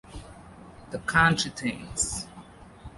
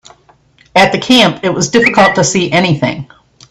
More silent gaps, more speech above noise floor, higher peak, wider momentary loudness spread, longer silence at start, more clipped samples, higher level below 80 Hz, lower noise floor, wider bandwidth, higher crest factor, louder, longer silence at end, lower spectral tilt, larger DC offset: neither; second, 22 dB vs 38 dB; second, -6 dBFS vs 0 dBFS; first, 26 LU vs 7 LU; second, 0.05 s vs 0.75 s; second, under 0.1% vs 0.1%; about the same, -48 dBFS vs -46 dBFS; about the same, -48 dBFS vs -48 dBFS; second, 11.5 kHz vs 14.5 kHz; first, 24 dB vs 12 dB; second, -26 LUFS vs -10 LUFS; second, 0 s vs 0.45 s; about the same, -3 dB/octave vs -4 dB/octave; neither